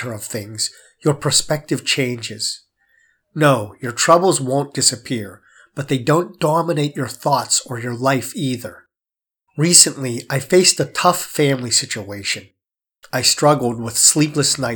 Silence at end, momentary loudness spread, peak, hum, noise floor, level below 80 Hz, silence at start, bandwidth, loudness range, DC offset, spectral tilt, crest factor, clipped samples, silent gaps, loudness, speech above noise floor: 0 s; 14 LU; 0 dBFS; none; -90 dBFS; -56 dBFS; 0 s; over 20 kHz; 5 LU; under 0.1%; -3 dB/octave; 18 dB; under 0.1%; none; -17 LUFS; 72 dB